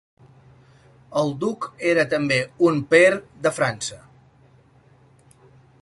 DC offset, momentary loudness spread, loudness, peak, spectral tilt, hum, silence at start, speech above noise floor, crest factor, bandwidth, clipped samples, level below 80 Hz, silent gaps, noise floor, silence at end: under 0.1%; 12 LU; -21 LUFS; -4 dBFS; -5 dB/octave; none; 1.1 s; 34 dB; 20 dB; 11.5 kHz; under 0.1%; -62 dBFS; none; -54 dBFS; 1.85 s